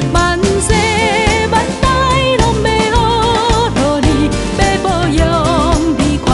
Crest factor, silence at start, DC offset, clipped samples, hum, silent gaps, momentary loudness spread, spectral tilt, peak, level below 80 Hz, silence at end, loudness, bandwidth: 12 dB; 0 s; under 0.1%; under 0.1%; none; none; 2 LU; -5 dB/octave; 0 dBFS; -20 dBFS; 0 s; -12 LUFS; 11.5 kHz